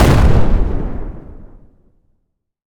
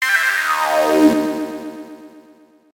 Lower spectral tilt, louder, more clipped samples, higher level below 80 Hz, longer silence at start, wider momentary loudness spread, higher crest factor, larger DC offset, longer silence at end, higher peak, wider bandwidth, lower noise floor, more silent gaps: first, -7 dB/octave vs -3 dB/octave; about the same, -16 LUFS vs -16 LUFS; neither; first, -18 dBFS vs -60 dBFS; about the same, 0 s vs 0 s; about the same, 21 LU vs 20 LU; about the same, 14 dB vs 18 dB; neither; first, 1.2 s vs 0.55 s; about the same, 0 dBFS vs 0 dBFS; about the same, 17.5 kHz vs 18 kHz; first, -67 dBFS vs -49 dBFS; neither